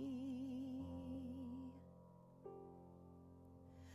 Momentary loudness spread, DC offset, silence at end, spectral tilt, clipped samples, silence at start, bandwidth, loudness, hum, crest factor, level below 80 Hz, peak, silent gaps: 15 LU; under 0.1%; 0 s; -8 dB/octave; under 0.1%; 0 s; 12 kHz; -52 LUFS; none; 12 dB; -68 dBFS; -40 dBFS; none